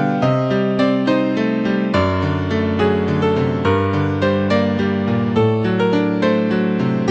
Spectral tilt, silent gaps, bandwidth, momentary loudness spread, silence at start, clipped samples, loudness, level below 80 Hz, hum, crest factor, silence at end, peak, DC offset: -8 dB/octave; none; 8 kHz; 2 LU; 0 s; under 0.1%; -17 LUFS; -48 dBFS; none; 14 dB; 0 s; -4 dBFS; under 0.1%